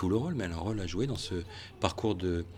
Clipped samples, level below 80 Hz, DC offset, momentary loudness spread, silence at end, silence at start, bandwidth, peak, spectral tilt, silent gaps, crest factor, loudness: under 0.1%; -48 dBFS; under 0.1%; 6 LU; 0 s; 0 s; 13.5 kHz; -10 dBFS; -6 dB/octave; none; 22 dB; -33 LUFS